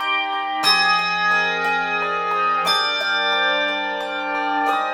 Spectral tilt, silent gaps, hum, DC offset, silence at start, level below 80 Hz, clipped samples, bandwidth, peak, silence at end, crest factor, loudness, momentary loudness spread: -1.5 dB/octave; none; none; under 0.1%; 0 s; -64 dBFS; under 0.1%; 16.5 kHz; -4 dBFS; 0 s; 16 dB; -19 LUFS; 7 LU